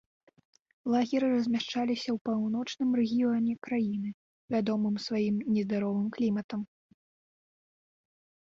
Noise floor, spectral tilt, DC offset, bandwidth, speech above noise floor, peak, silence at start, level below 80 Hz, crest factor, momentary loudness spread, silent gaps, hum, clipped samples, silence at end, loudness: under -90 dBFS; -6.5 dB/octave; under 0.1%; 7.4 kHz; over 61 dB; -16 dBFS; 0.85 s; -72 dBFS; 16 dB; 6 LU; 2.21-2.25 s, 4.14-4.48 s, 6.44-6.49 s; none; under 0.1%; 1.85 s; -30 LUFS